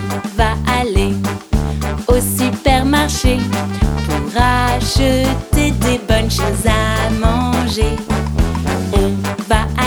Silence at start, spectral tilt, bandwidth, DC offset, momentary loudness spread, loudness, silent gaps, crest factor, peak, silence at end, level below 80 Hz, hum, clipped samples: 0 s; -5 dB/octave; 19.5 kHz; under 0.1%; 5 LU; -16 LUFS; none; 14 dB; -2 dBFS; 0 s; -20 dBFS; none; under 0.1%